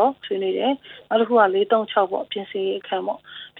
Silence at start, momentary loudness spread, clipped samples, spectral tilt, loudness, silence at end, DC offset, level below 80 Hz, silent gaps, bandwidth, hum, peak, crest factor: 0 s; 11 LU; under 0.1%; -7.5 dB/octave; -22 LUFS; 0 s; under 0.1%; -72 dBFS; none; 4.2 kHz; none; -4 dBFS; 18 dB